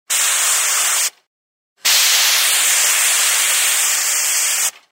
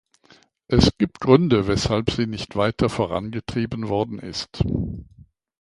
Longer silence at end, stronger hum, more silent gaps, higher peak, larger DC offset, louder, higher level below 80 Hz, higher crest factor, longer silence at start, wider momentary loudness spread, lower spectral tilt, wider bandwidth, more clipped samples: second, 0.2 s vs 0.6 s; neither; first, 1.27-1.76 s vs none; about the same, -2 dBFS vs 0 dBFS; neither; first, -13 LUFS vs -22 LUFS; second, -82 dBFS vs -38 dBFS; second, 14 dB vs 22 dB; second, 0.1 s vs 0.7 s; second, 5 LU vs 11 LU; second, 5.5 dB/octave vs -6.5 dB/octave; first, 16.5 kHz vs 11.5 kHz; neither